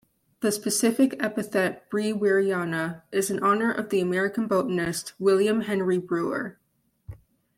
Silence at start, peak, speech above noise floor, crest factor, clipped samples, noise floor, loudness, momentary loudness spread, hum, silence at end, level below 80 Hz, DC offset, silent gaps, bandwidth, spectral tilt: 0.4 s; -10 dBFS; 24 dB; 16 dB; under 0.1%; -49 dBFS; -25 LUFS; 6 LU; none; 0.4 s; -62 dBFS; under 0.1%; none; 16 kHz; -4.5 dB/octave